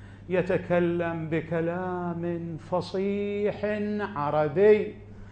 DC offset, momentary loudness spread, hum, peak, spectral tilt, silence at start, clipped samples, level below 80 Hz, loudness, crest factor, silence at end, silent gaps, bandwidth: under 0.1%; 10 LU; none; -10 dBFS; -8.5 dB/octave; 0 s; under 0.1%; -54 dBFS; -27 LUFS; 18 dB; 0 s; none; 8.6 kHz